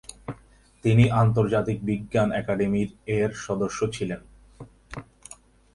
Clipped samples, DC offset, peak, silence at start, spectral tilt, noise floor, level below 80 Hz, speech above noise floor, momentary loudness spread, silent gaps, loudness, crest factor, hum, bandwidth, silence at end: under 0.1%; under 0.1%; -6 dBFS; 0.1 s; -7 dB/octave; -54 dBFS; -48 dBFS; 31 dB; 22 LU; none; -24 LUFS; 18 dB; none; 11.5 kHz; 0.4 s